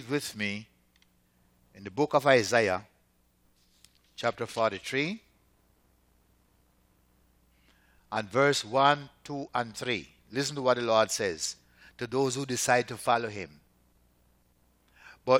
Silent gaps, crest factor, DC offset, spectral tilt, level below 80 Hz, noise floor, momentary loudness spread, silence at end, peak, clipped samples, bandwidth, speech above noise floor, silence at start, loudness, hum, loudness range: none; 22 dB; under 0.1%; -3.5 dB/octave; -68 dBFS; -68 dBFS; 16 LU; 0 s; -8 dBFS; under 0.1%; 17 kHz; 40 dB; 0 s; -29 LUFS; 60 Hz at -65 dBFS; 7 LU